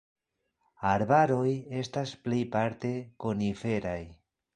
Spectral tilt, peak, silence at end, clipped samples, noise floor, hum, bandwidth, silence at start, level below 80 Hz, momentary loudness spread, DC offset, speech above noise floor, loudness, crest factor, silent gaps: -7 dB/octave; -10 dBFS; 0.4 s; under 0.1%; -79 dBFS; none; 10 kHz; 0.8 s; -58 dBFS; 11 LU; under 0.1%; 50 dB; -30 LUFS; 20 dB; none